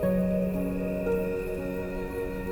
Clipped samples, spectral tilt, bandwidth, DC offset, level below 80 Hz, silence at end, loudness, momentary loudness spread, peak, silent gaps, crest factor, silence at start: under 0.1%; -8.5 dB/octave; over 20 kHz; under 0.1%; -42 dBFS; 0 s; -30 LUFS; 7 LU; -16 dBFS; none; 12 dB; 0 s